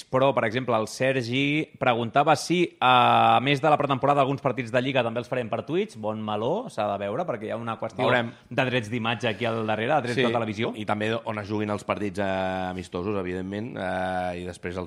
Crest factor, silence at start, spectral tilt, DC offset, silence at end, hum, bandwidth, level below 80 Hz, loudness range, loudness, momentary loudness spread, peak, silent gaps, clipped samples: 18 dB; 0.1 s; -5.5 dB/octave; under 0.1%; 0 s; none; 13.5 kHz; -62 dBFS; 7 LU; -25 LUFS; 10 LU; -6 dBFS; none; under 0.1%